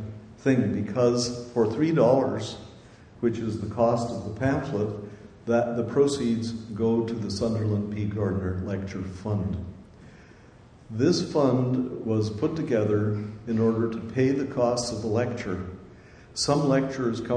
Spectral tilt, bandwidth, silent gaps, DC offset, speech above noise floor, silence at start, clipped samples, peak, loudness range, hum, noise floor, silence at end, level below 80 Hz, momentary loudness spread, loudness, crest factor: -6.5 dB/octave; 10 kHz; none; under 0.1%; 26 dB; 0 s; under 0.1%; -8 dBFS; 4 LU; none; -51 dBFS; 0 s; -54 dBFS; 10 LU; -26 LUFS; 18 dB